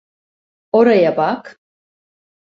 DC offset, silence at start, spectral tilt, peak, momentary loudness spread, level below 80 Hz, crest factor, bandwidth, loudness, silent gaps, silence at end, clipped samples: under 0.1%; 0.75 s; -7.5 dB/octave; -2 dBFS; 9 LU; -64 dBFS; 16 dB; 7 kHz; -14 LUFS; none; 0.95 s; under 0.1%